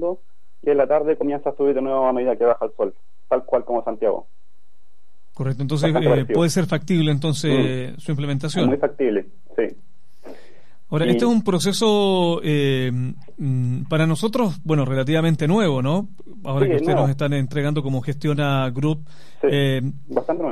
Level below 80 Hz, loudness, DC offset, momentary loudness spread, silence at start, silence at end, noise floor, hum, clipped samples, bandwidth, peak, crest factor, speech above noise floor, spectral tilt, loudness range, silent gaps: -60 dBFS; -21 LUFS; 3%; 9 LU; 0 s; 0 s; -66 dBFS; none; under 0.1%; 13.5 kHz; -4 dBFS; 16 dB; 46 dB; -6.5 dB/octave; 3 LU; none